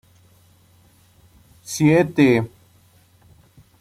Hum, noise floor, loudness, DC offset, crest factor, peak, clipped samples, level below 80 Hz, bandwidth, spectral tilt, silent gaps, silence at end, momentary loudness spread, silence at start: none; -55 dBFS; -18 LUFS; under 0.1%; 20 dB; -4 dBFS; under 0.1%; -56 dBFS; 15.5 kHz; -6 dB/octave; none; 1.35 s; 18 LU; 1.7 s